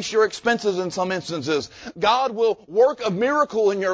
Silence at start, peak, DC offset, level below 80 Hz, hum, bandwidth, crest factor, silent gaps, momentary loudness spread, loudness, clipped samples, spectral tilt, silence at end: 0 s; -6 dBFS; under 0.1%; -60 dBFS; none; 8 kHz; 16 dB; none; 6 LU; -21 LUFS; under 0.1%; -4 dB/octave; 0 s